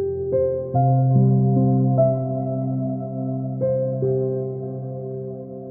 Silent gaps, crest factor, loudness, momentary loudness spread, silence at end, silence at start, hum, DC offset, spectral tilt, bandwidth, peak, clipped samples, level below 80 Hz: none; 14 dB; -22 LUFS; 13 LU; 0 s; 0 s; none; under 0.1%; -17.5 dB/octave; 1.7 kHz; -6 dBFS; under 0.1%; -54 dBFS